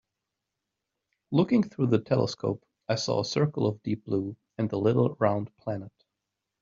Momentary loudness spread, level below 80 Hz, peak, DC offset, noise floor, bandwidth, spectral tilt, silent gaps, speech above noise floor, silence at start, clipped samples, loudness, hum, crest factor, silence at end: 11 LU; -66 dBFS; -8 dBFS; under 0.1%; -85 dBFS; 7.6 kHz; -6.5 dB/octave; none; 59 dB; 1.3 s; under 0.1%; -28 LUFS; none; 20 dB; 0.75 s